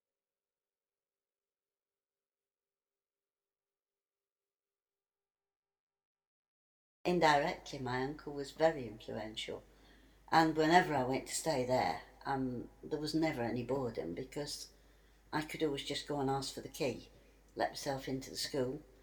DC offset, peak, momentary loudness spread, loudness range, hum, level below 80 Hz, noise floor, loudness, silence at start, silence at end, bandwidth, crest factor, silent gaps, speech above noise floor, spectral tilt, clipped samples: under 0.1%; -14 dBFS; 15 LU; 6 LU; none; -64 dBFS; under -90 dBFS; -36 LUFS; 7.05 s; 0.2 s; 20 kHz; 24 dB; none; over 54 dB; -4.5 dB/octave; under 0.1%